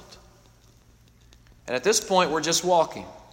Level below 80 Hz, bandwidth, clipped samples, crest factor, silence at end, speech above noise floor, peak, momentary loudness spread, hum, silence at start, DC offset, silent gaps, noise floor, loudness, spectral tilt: -58 dBFS; 16.5 kHz; under 0.1%; 20 dB; 0.15 s; 32 dB; -6 dBFS; 14 LU; none; 0.1 s; under 0.1%; none; -56 dBFS; -23 LUFS; -2.5 dB/octave